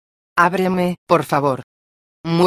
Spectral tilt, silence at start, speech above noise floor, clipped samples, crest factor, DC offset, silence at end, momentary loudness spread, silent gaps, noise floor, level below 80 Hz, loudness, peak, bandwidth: -6.5 dB/octave; 0.35 s; over 73 dB; under 0.1%; 18 dB; under 0.1%; 0 s; 9 LU; 0.98-1.07 s, 1.63-2.24 s; under -90 dBFS; -56 dBFS; -18 LUFS; 0 dBFS; 15.5 kHz